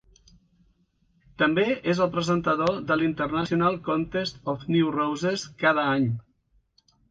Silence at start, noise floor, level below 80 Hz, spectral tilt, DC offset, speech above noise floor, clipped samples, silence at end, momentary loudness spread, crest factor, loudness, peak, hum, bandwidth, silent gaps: 1.4 s; -67 dBFS; -56 dBFS; -6 dB/octave; under 0.1%; 42 dB; under 0.1%; 0.9 s; 6 LU; 18 dB; -25 LUFS; -8 dBFS; none; 9 kHz; none